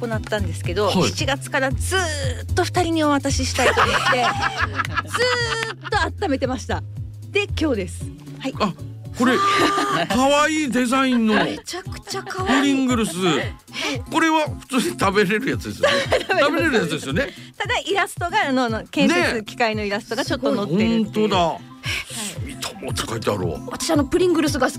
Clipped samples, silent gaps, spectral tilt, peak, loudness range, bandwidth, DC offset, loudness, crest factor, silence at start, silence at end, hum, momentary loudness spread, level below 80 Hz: under 0.1%; none; -4.5 dB/octave; -8 dBFS; 4 LU; 16 kHz; under 0.1%; -21 LUFS; 14 dB; 0 s; 0 s; none; 10 LU; -40 dBFS